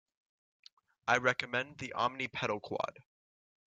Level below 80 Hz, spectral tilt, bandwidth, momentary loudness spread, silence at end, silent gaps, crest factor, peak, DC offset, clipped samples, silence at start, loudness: -74 dBFS; -4 dB/octave; 9.2 kHz; 11 LU; 0.65 s; none; 24 dB; -12 dBFS; under 0.1%; under 0.1%; 1.05 s; -34 LUFS